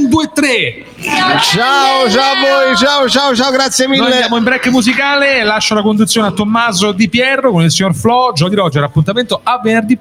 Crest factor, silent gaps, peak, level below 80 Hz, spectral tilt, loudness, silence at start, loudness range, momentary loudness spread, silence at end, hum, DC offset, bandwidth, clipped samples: 10 dB; none; 0 dBFS; -46 dBFS; -4 dB/octave; -10 LUFS; 0 s; 2 LU; 4 LU; 0.05 s; none; under 0.1%; 16.5 kHz; under 0.1%